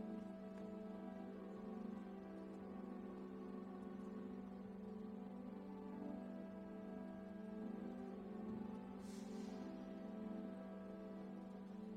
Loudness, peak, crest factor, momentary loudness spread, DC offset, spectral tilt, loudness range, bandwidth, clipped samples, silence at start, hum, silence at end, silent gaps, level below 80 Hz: -52 LUFS; -38 dBFS; 12 dB; 3 LU; under 0.1%; -8 dB/octave; 1 LU; 10.5 kHz; under 0.1%; 0 s; none; 0 s; none; -76 dBFS